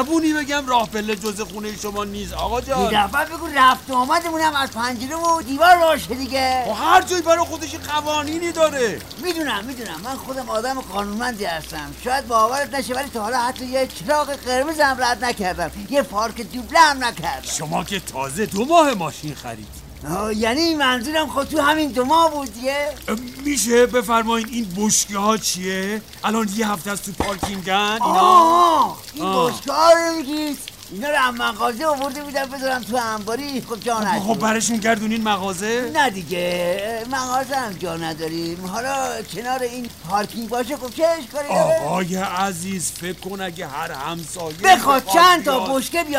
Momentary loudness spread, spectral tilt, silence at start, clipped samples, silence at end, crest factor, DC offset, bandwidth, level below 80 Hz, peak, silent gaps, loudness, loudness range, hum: 12 LU; -3 dB/octave; 0 s; under 0.1%; 0 s; 18 dB; 0.2%; 16 kHz; -46 dBFS; -2 dBFS; none; -20 LUFS; 6 LU; none